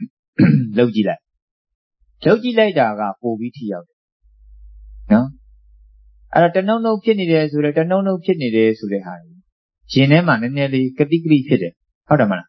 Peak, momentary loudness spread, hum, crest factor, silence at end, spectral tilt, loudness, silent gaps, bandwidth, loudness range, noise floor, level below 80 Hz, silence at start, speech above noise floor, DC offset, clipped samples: 0 dBFS; 12 LU; none; 16 dB; 0.05 s; -8.5 dB/octave; -17 LUFS; 0.10-0.33 s, 1.42-1.65 s, 1.75-1.91 s, 3.93-4.20 s, 9.52-9.69 s, 11.95-12.01 s; 6 kHz; 4 LU; -48 dBFS; -50 dBFS; 0 s; 32 dB; under 0.1%; under 0.1%